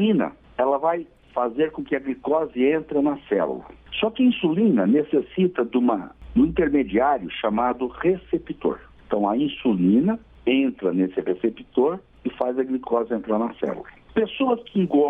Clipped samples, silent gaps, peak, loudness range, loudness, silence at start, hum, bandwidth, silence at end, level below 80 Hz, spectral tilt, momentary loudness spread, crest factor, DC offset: under 0.1%; none; -8 dBFS; 3 LU; -23 LUFS; 0 s; none; 3.8 kHz; 0 s; -50 dBFS; -9.5 dB/octave; 8 LU; 14 dB; under 0.1%